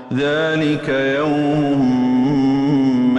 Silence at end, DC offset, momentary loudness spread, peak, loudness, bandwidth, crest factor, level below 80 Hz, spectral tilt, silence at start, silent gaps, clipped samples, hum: 0 s; under 0.1%; 3 LU; -8 dBFS; -17 LUFS; 8.4 kHz; 8 dB; -48 dBFS; -7 dB/octave; 0 s; none; under 0.1%; none